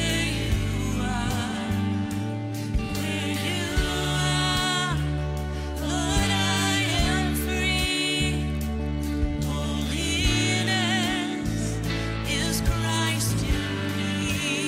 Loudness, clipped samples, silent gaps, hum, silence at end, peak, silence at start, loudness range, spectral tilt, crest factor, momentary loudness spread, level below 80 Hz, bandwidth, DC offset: -25 LUFS; under 0.1%; none; none; 0 s; -8 dBFS; 0 s; 3 LU; -4 dB/octave; 16 dB; 6 LU; -32 dBFS; 16 kHz; under 0.1%